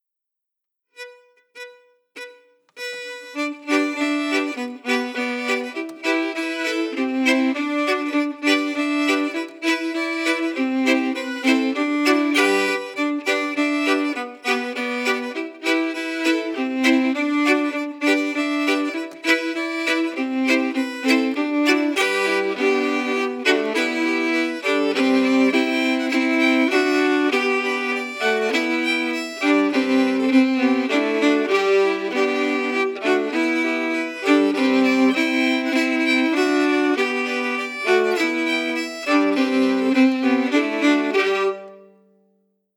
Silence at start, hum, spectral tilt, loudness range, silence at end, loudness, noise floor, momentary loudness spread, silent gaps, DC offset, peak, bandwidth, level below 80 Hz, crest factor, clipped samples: 1 s; none; -3 dB/octave; 4 LU; 1 s; -20 LUFS; -83 dBFS; 7 LU; none; under 0.1%; -2 dBFS; 16.5 kHz; -90 dBFS; 18 dB; under 0.1%